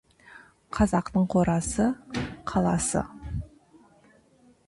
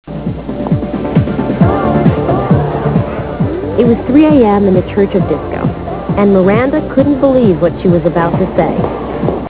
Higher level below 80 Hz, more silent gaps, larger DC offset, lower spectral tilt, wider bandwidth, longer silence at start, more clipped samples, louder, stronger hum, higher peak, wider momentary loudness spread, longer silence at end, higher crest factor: second, -44 dBFS vs -28 dBFS; neither; second, under 0.1% vs 0.4%; second, -6 dB/octave vs -12.5 dB/octave; first, 11.5 kHz vs 4 kHz; first, 0.35 s vs 0.05 s; second, under 0.1% vs 0.3%; second, -27 LUFS vs -12 LUFS; neither; second, -10 dBFS vs 0 dBFS; first, 13 LU vs 8 LU; first, 1.2 s vs 0 s; first, 18 dB vs 12 dB